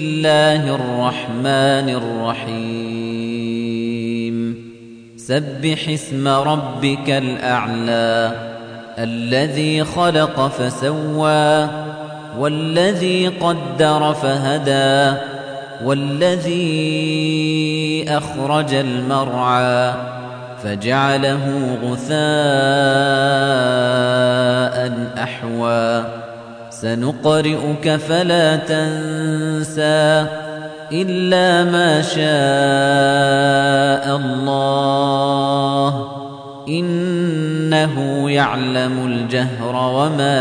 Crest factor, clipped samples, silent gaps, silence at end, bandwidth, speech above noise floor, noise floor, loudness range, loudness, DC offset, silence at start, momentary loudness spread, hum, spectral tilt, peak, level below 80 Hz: 14 dB; under 0.1%; none; 0 s; 10.5 kHz; 22 dB; -38 dBFS; 5 LU; -17 LUFS; under 0.1%; 0 s; 10 LU; none; -5.5 dB/octave; -2 dBFS; -56 dBFS